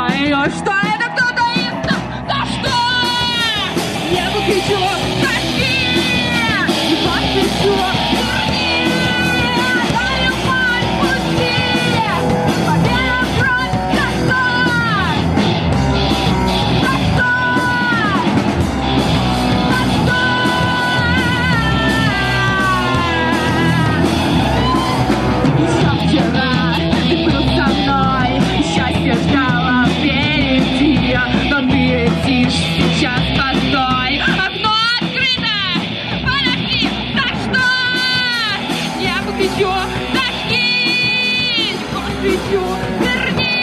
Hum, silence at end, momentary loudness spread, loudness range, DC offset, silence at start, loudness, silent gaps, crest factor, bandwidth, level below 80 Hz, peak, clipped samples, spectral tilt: none; 0 s; 3 LU; 1 LU; under 0.1%; 0 s; -15 LUFS; none; 14 dB; 13.5 kHz; -30 dBFS; -2 dBFS; under 0.1%; -5 dB/octave